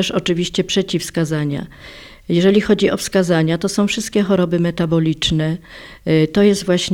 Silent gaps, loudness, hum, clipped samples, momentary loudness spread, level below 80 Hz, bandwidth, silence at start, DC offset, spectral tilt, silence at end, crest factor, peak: none; -17 LUFS; none; under 0.1%; 14 LU; -42 dBFS; 16.5 kHz; 0 s; under 0.1%; -5.5 dB/octave; 0 s; 14 dB; -2 dBFS